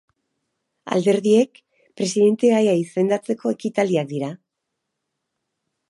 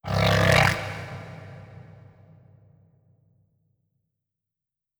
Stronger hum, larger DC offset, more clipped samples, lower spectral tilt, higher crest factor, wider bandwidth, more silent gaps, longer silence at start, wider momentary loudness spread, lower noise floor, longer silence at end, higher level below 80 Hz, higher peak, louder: neither; neither; neither; about the same, -6 dB/octave vs -5 dB/octave; second, 18 dB vs 24 dB; second, 11.5 kHz vs over 20 kHz; neither; first, 0.85 s vs 0.05 s; second, 10 LU vs 26 LU; second, -79 dBFS vs -89 dBFS; second, 1.55 s vs 3.2 s; second, -72 dBFS vs -44 dBFS; about the same, -4 dBFS vs -4 dBFS; about the same, -20 LUFS vs -21 LUFS